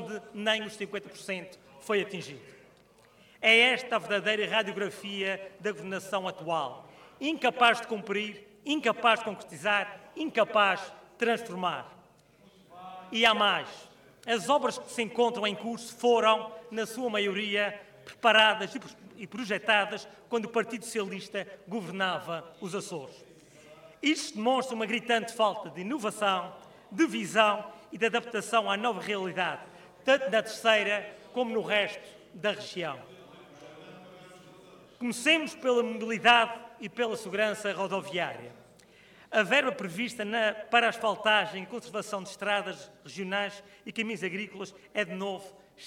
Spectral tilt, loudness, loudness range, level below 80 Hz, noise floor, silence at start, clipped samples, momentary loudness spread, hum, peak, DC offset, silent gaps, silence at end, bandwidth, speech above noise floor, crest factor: -3 dB/octave; -29 LUFS; 7 LU; -74 dBFS; -60 dBFS; 0 s; under 0.1%; 16 LU; none; -8 dBFS; under 0.1%; none; 0 s; 16.5 kHz; 31 dB; 22 dB